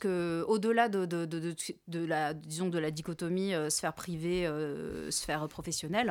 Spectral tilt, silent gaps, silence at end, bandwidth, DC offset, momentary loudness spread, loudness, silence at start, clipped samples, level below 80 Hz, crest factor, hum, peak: -4.5 dB/octave; none; 0 s; 18.5 kHz; under 0.1%; 9 LU; -33 LUFS; 0 s; under 0.1%; -60 dBFS; 20 dB; none; -14 dBFS